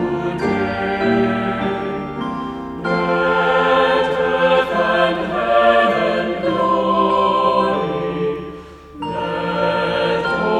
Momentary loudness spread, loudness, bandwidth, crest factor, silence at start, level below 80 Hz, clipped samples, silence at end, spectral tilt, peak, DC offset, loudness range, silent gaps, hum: 10 LU; -17 LUFS; 10 kHz; 16 dB; 0 s; -44 dBFS; under 0.1%; 0 s; -6.5 dB/octave; -2 dBFS; under 0.1%; 4 LU; none; none